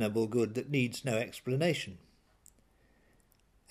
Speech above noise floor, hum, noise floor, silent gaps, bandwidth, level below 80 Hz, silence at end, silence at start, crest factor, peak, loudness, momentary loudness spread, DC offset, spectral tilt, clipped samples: 35 dB; none; -68 dBFS; none; 15.5 kHz; -70 dBFS; 1.75 s; 0 s; 18 dB; -16 dBFS; -33 LUFS; 5 LU; under 0.1%; -5.5 dB/octave; under 0.1%